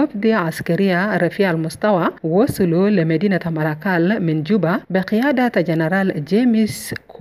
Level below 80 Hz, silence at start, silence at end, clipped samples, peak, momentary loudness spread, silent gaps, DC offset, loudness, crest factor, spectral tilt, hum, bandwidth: -52 dBFS; 0 s; 0 s; under 0.1%; -4 dBFS; 4 LU; none; under 0.1%; -18 LUFS; 14 dB; -7 dB/octave; none; 15.5 kHz